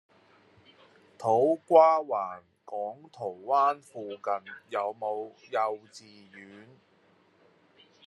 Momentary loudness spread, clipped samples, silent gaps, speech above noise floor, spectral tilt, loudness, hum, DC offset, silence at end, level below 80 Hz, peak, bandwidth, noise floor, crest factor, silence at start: 24 LU; under 0.1%; none; 36 dB; -6 dB/octave; -28 LUFS; none; under 0.1%; 1.45 s; -88 dBFS; -6 dBFS; 11.5 kHz; -64 dBFS; 24 dB; 1.2 s